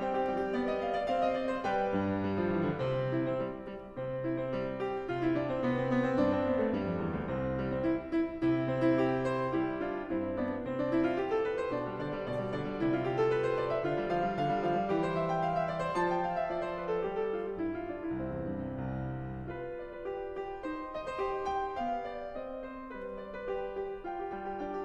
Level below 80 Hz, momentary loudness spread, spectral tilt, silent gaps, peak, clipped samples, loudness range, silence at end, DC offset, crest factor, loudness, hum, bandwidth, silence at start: -54 dBFS; 9 LU; -8 dB/octave; none; -16 dBFS; under 0.1%; 6 LU; 0 s; under 0.1%; 16 dB; -33 LUFS; none; 9 kHz; 0 s